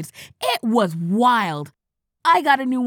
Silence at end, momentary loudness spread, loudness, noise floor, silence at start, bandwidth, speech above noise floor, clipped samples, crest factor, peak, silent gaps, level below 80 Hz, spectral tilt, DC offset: 0 s; 14 LU; -19 LUFS; -39 dBFS; 0 s; over 20 kHz; 20 dB; under 0.1%; 18 dB; -4 dBFS; none; -74 dBFS; -5 dB/octave; under 0.1%